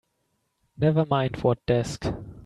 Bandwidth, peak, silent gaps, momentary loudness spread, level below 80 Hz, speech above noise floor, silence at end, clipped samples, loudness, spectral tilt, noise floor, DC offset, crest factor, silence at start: 11.5 kHz; -8 dBFS; none; 8 LU; -48 dBFS; 50 dB; 0.05 s; under 0.1%; -25 LUFS; -7 dB/octave; -74 dBFS; under 0.1%; 18 dB; 0.8 s